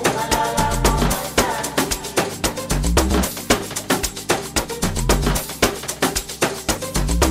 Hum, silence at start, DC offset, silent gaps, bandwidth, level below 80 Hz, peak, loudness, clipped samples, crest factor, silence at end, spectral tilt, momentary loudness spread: none; 0 s; under 0.1%; none; 16 kHz; -26 dBFS; -2 dBFS; -20 LUFS; under 0.1%; 18 dB; 0 s; -3.5 dB/octave; 4 LU